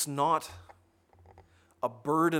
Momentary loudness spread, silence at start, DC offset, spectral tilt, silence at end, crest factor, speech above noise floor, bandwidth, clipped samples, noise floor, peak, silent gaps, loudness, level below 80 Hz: 18 LU; 0 s; under 0.1%; -4.5 dB/octave; 0 s; 18 dB; 34 dB; 17 kHz; under 0.1%; -63 dBFS; -14 dBFS; none; -31 LUFS; -68 dBFS